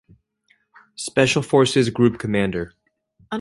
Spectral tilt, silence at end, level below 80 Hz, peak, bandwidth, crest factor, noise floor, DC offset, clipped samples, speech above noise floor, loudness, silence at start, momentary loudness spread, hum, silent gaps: -5 dB/octave; 0 s; -50 dBFS; -2 dBFS; 11.5 kHz; 18 dB; -64 dBFS; under 0.1%; under 0.1%; 45 dB; -19 LUFS; 1 s; 15 LU; none; none